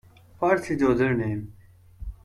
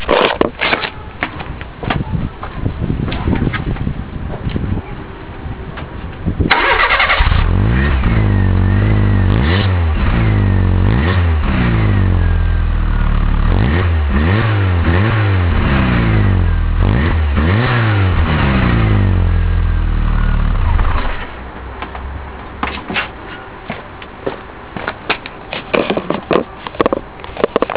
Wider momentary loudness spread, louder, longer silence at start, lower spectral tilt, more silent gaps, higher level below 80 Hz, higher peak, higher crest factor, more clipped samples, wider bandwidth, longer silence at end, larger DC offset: first, 21 LU vs 14 LU; second, -24 LUFS vs -15 LUFS; first, 0.4 s vs 0 s; second, -7.5 dB/octave vs -10.5 dB/octave; neither; second, -46 dBFS vs -18 dBFS; second, -8 dBFS vs 0 dBFS; about the same, 18 dB vs 14 dB; neither; first, 13.5 kHz vs 4 kHz; about the same, 0.1 s vs 0 s; second, under 0.1% vs 0.4%